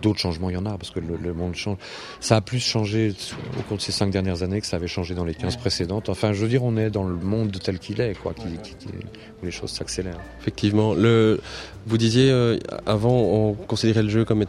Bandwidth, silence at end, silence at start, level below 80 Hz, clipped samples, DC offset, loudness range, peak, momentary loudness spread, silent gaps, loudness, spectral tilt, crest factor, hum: 12 kHz; 0 s; 0 s; -46 dBFS; under 0.1%; under 0.1%; 7 LU; -2 dBFS; 14 LU; none; -23 LUFS; -6 dB/octave; 20 dB; none